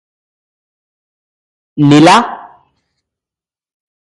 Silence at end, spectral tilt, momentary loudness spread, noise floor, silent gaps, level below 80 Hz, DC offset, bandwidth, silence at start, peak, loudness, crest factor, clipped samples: 1.7 s; -5.5 dB/octave; 22 LU; -89 dBFS; none; -52 dBFS; under 0.1%; 11.5 kHz; 1.75 s; 0 dBFS; -8 LUFS; 14 dB; under 0.1%